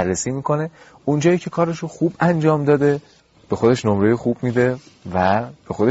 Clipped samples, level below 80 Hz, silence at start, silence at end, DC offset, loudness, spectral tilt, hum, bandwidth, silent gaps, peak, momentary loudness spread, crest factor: under 0.1%; -52 dBFS; 0 s; 0 s; under 0.1%; -19 LUFS; -7 dB/octave; none; 8 kHz; none; -4 dBFS; 10 LU; 16 dB